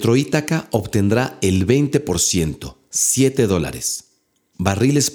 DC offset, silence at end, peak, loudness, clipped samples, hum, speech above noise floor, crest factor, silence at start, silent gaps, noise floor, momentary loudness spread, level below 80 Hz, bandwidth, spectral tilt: under 0.1%; 0 s; 0 dBFS; -18 LUFS; under 0.1%; none; 45 dB; 18 dB; 0 s; none; -62 dBFS; 8 LU; -44 dBFS; over 20 kHz; -4.5 dB/octave